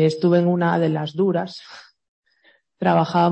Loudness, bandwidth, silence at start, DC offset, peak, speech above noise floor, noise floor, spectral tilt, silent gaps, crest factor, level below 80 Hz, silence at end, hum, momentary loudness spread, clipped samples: -20 LUFS; 8.4 kHz; 0 s; under 0.1%; -4 dBFS; 41 dB; -60 dBFS; -8 dB/octave; 2.08-2.22 s; 16 dB; -66 dBFS; 0 s; none; 14 LU; under 0.1%